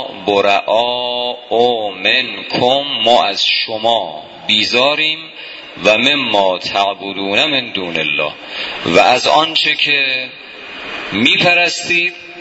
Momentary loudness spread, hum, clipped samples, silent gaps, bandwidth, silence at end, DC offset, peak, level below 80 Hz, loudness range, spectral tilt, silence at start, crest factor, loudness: 12 LU; none; under 0.1%; none; 8 kHz; 0 s; under 0.1%; 0 dBFS; -56 dBFS; 2 LU; -3 dB/octave; 0 s; 14 dB; -13 LUFS